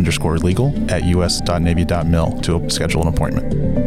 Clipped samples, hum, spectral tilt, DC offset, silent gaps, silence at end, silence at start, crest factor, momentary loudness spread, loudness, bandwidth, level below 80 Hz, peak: under 0.1%; none; -5.5 dB/octave; under 0.1%; none; 0 s; 0 s; 10 dB; 3 LU; -18 LUFS; 15.5 kHz; -26 dBFS; -6 dBFS